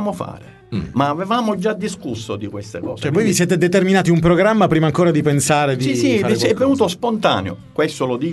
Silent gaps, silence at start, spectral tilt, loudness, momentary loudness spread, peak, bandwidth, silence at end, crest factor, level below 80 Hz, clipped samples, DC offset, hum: none; 0 s; -5.5 dB/octave; -17 LUFS; 13 LU; 0 dBFS; 12 kHz; 0 s; 16 dB; -46 dBFS; under 0.1%; under 0.1%; none